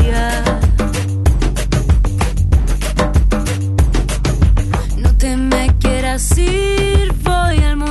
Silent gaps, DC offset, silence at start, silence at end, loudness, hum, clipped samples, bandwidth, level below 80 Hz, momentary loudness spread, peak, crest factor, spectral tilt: none; under 0.1%; 0 s; 0 s; -15 LUFS; none; under 0.1%; 12.5 kHz; -14 dBFS; 3 LU; -2 dBFS; 10 dB; -5.5 dB/octave